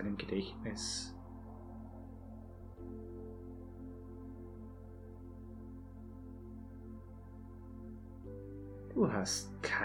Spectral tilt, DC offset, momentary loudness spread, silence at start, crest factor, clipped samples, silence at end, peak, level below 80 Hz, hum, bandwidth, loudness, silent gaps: -4 dB/octave; under 0.1%; 15 LU; 0 s; 22 dB; under 0.1%; 0 s; -20 dBFS; -56 dBFS; none; 19 kHz; -44 LUFS; none